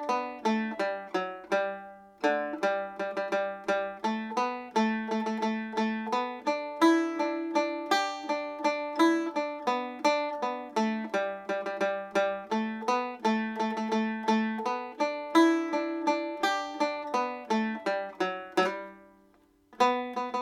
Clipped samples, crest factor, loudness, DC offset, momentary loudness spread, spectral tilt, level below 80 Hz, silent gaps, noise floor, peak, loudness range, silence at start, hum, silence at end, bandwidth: under 0.1%; 20 dB; -30 LUFS; under 0.1%; 7 LU; -4.5 dB/octave; -76 dBFS; none; -63 dBFS; -10 dBFS; 3 LU; 0 s; none; 0 s; 15 kHz